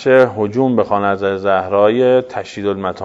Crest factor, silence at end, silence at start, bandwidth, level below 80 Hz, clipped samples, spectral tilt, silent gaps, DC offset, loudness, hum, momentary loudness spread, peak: 14 dB; 0 s; 0 s; 7.8 kHz; -56 dBFS; under 0.1%; -7 dB/octave; none; under 0.1%; -15 LUFS; none; 9 LU; 0 dBFS